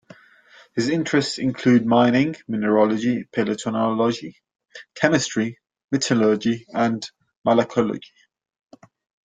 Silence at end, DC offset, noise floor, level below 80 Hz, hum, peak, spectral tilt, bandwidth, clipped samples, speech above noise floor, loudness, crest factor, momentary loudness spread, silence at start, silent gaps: 1.25 s; under 0.1%; -52 dBFS; -62 dBFS; none; -2 dBFS; -5.5 dB/octave; 9.4 kHz; under 0.1%; 32 dB; -21 LUFS; 20 dB; 11 LU; 0.75 s; 5.84-5.88 s, 7.37-7.42 s